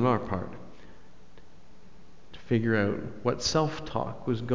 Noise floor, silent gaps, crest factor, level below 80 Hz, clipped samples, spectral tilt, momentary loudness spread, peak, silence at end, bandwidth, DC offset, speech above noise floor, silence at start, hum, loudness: -56 dBFS; none; 18 dB; -52 dBFS; under 0.1%; -5.5 dB/octave; 18 LU; -12 dBFS; 0 s; 7.6 kHz; 0.9%; 28 dB; 0 s; none; -29 LUFS